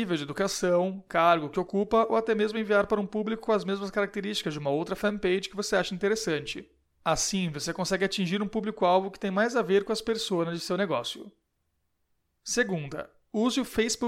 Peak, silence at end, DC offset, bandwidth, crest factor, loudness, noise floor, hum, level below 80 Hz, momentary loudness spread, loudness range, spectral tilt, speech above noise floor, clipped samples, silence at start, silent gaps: -10 dBFS; 0 s; under 0.1%; 16.5 kHz; 18 dB; -28 LUFS; -76 dBFS; none; -58 dBFS; 7 LU; 5 LU; -4 dB/octave; 49 dB; under 0.1%; 0 s; none